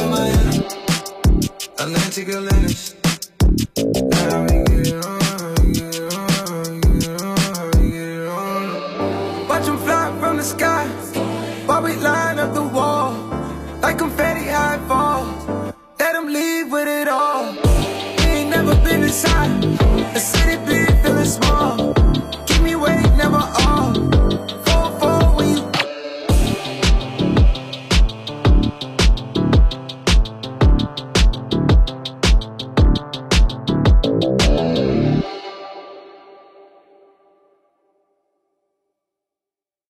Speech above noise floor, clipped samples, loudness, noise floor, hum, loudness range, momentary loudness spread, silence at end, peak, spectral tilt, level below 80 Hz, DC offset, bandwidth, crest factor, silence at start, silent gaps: 72 dB; under 0.1%; -18 LUFS; -90 dBFS; none; 4 LU; 8 LU; 3.75 s; -2 dBFS; -5 dB/octave; -20 dBFS; under 0.1%; 15 kHz; 14 dB; 0 s; none